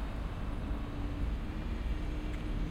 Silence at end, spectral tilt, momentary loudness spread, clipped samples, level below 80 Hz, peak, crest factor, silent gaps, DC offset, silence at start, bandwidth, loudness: 0 s; -7.5 dB/octave; 2 LU; under 0.1%; -36 dBFS; -24 dBFS; 12 dB; none; under 0.1%; 0 s; 10.5 kHz; -39 LUFS